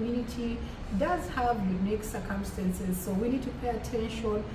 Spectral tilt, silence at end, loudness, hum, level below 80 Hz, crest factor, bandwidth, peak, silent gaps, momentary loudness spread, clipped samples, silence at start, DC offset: -6.5 dB/octave; 0 s; -32 LUFS; none; -42 dBFS; 14 dB; 16 kHz; -16 dBFS; none; 5 LU; under 0.1%; 0 s; under 0.1%